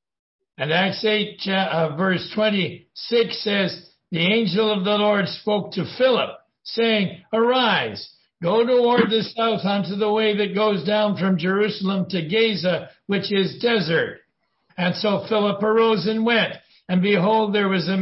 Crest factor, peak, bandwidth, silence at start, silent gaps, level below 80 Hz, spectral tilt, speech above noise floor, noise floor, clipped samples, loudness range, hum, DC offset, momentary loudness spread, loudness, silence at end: 16 dB; -4 dBFS; 5.8 kHz; 0.6 s; none; -64 dBFS; -9 dB/octave; 45 dB; -65 dBFS; under 0.1%; 2 LU; none; under 0.1%; 8 LU; -21 LUFS; 0 s